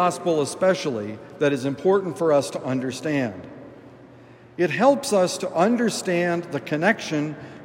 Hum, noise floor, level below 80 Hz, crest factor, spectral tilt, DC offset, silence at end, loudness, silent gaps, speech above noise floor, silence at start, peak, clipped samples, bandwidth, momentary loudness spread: none; -47 dBFS; -68 dBFS; 18 dB; -5 dB/octave; under 0.1%; 0 s; -23 LUFS; none; 25 dB; 0 s; -4 dBFS; under 0.1%; 16 kHz; 11 LU